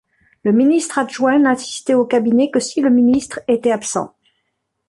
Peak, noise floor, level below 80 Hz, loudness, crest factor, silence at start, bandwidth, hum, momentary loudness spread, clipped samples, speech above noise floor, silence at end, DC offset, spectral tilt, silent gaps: -4 dBFS; -72 dBFS; -58 dBFS; -16 LUFS; 14 dB; 0.45 s; 11.5 kHz; none; 7 LU; under 0.1%; 57 dB; 0.8 s; under 0.1%; -4.5 dB/octave; none